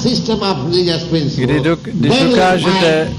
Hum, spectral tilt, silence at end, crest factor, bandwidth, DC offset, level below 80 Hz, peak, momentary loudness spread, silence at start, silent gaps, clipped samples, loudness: none; -5.5 dB/octave; 0 s; 10 dB; 12 kHz; under 0.1%; -38 dBFS; -4 dBFS; 5 LU; 0 s; none; under 0.1%; -14 LUFS